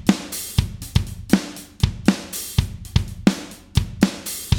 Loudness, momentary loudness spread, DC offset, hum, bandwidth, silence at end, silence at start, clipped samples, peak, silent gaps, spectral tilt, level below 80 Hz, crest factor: -23 LUFS; 5 LU; under 0.1%; none; over 20 kHz; 0 s; 0 s; under 0.1%; 0 dBFS; none; -5 dB/octave; -32 dBFS; 20 dB